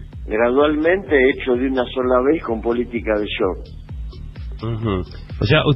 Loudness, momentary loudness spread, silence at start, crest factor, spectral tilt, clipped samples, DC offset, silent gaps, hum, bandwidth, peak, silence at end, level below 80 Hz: -19 LUFS; 18 LU; 0 s; 16 dB; -9 dB/octave; under 0.1%; under 0.1%; none; none; 5.8 kHz; -2 dBFS; 0 s; -34 dBFS